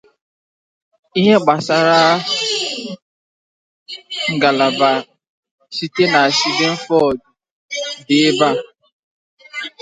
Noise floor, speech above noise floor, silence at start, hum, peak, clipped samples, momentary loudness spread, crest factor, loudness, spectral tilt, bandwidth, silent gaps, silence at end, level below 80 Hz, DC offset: under -90 dBFS; over 75 dB; 1.15 s; none; 0 dBFS; under 0.1%; 15 LU; 18 dB; -15 LUFS; -4 dB/octave; 9.6 kHz; 3.02-3.86 s, 5.28-5.43 s, 5.51-5.58 s, 7.51-7.69 s, 8.92-9.37 s; 0.15 s; -60 dBFS; under 0.1%